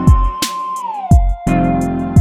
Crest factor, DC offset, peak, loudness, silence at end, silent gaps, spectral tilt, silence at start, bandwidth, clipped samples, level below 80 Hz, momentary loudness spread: 12 dB; under 0.1%; 0 dBFS; -16 LUFS; 0 s; none; -6.5 dB/octave; 0 s; 16.5 kHz; under 0.1%; -18 dBFS; 8 LU